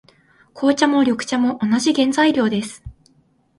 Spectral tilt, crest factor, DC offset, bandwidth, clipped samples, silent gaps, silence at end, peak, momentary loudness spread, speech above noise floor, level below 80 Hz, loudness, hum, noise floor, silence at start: -4 dB/octave; 18 dB; under 0.1%; 11.5 kHz; under 0.1%; none; 0.7 s; 0 dBFS; 8 LU; 41 dB; -52 dBFS; -18 LUFS; none; -59 dBFS; 0.55 s